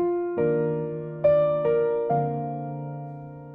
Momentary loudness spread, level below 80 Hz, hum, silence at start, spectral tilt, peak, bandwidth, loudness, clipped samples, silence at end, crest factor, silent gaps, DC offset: 14 LU; -60 dBFS; none; 0 s; -11.5 dB/octave; -10 dBFS; 4 kHz; -25 LUFS; under 0.1%; 0 s; 14 dB; none; under 0.1%